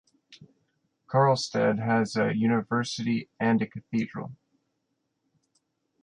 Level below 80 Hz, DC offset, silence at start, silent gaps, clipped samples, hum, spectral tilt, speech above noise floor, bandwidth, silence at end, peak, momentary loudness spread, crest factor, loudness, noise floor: -68 dBFS; under 0.1%; 0.3 s; none; under 0.1%; none; -6 dB/octave; 52 dB; 10 kHz; 1.7 s; -10 dBFS; 8 LU; 18 dB; -26 LUFS; -78 dBFS